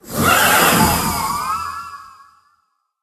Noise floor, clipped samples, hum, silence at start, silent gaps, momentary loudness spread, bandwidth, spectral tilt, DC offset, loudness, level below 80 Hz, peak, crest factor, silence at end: -65 dBFS; under 0.1%; none; 0.05 s; none; 17 LU; 14 kHz; -3 dB/octave; under 0.1%; -15 LUFS; -38 dBFS; 0 dBFS; 18 dB; 0.95 s